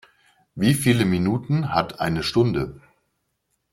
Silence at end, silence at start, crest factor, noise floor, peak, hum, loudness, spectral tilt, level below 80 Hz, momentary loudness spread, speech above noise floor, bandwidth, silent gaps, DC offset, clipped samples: 0.95 s; 0.55 s; 18 dB; -74 dBFS; -4 dBFS; none; -22 LUFS; -6 dB/octave; -50 dBFS; 8 LU; 53 dB; 16.5 kHz; none; under 0.1%; under 0.1%